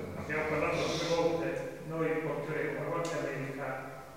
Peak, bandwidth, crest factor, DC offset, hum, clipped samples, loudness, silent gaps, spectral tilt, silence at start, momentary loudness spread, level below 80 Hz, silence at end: -18 dBFS; 16 kHz; 16 dB; 0.1%; none; under 0.1%; -34 LUFS; none; -5 dB/octave; 0 s; 8 LU; -60 dBFS; 0 s